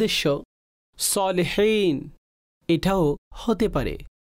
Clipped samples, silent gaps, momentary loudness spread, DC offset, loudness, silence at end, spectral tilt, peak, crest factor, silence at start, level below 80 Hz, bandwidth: under 0.1%; 0.45-0.93 s, 2.18-2.61 s, 3.18-3.31 s; 10 LU; under 0.1%; -23 LUFS; 0.15 s; -4.5 dB/octave; -12 dBFS; 12 dB; 0 s; -42 dBFS; 16 kHz